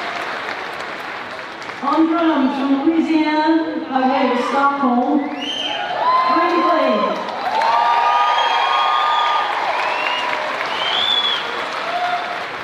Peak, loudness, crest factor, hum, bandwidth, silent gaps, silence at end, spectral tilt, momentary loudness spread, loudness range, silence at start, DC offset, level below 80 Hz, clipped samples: -4 dBFS; -17 LUFS; 14 dB; none; 12 kHz; none; 0 s; -3.5 dB/octave; 9 LU; 2 LU; 0 s; under 0.1%; -64 dBFS; under 0.1%